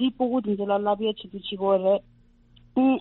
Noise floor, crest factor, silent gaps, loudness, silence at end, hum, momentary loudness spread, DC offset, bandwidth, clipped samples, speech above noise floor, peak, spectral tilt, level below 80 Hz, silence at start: -56 dBFS; 14 dB; none; -25 LUFS; 0 s; none; 8 LU; under 0.1%; 4.1 kHz; under 0.1%; 32 dB; -10 dBFS; -5 dB/octave; -60 dBFS; 0 s